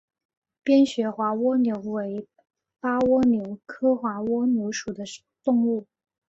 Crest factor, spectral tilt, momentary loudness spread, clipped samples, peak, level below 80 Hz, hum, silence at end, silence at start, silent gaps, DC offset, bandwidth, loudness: 16 dB; -5.5 dB/octave; 13 LU; under 0.1%; -10 dBFS; -62 dBFS; none; 0.45 s; 0.65 s; none; under 0.1%; 8 kHz; -24 LUFS